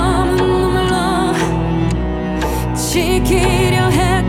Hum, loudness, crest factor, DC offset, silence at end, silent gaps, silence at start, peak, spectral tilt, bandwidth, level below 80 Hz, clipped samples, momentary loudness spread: none; -15 LUFS; 14 dB; under 0.1%; 0 s; none; 0 s; -2 dBFS; -5.5 dB/octave; 17 kHz; -24 dBFS; under 0.1%; 5 LU